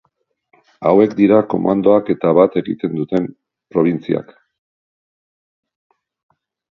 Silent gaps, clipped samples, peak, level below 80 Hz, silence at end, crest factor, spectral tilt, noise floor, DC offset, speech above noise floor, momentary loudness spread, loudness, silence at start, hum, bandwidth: none; under 0.1%; 0 dBFS; -58 dBFS; 2.55 s; 18 dB; -9.5 dB/octave; -68 dBFS; under 0.1%; 53 dB; 10 LU; -16 LUFS; 0.8 s; none; 6 kHz